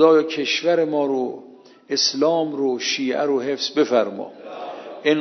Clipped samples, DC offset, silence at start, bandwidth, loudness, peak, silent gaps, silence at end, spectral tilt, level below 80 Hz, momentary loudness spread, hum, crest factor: under 0.1%; under 0.1%; 0 s; 6.4 kHz; -21 LUFS; -2 dBFS; none; 0 s; -3.5 dB/octave; -80 dBFS; 15 LU; none; 18 dB